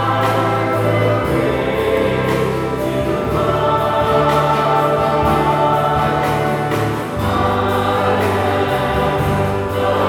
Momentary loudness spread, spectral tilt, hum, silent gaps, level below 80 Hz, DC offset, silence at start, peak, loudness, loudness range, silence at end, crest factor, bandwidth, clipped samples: 4 LU; -6.5 dB/octave; none; none; -36 dBFS; under 0.1%; 0 s; -2 dBFS; -16 LUFS; 2 LU; 0 s; 12 dB; 19 kHz; under 0.1%